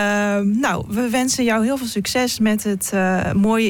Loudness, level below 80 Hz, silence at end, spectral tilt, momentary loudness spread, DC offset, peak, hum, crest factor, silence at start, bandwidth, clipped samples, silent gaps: -19 LUFS; -46 dBFS; 0 s; -4.5 dB/octave; 3 LU; under 0.1%; -8 dBFS; none; 10 dB; 0 s; 17.5 kHz; under 0.1%; none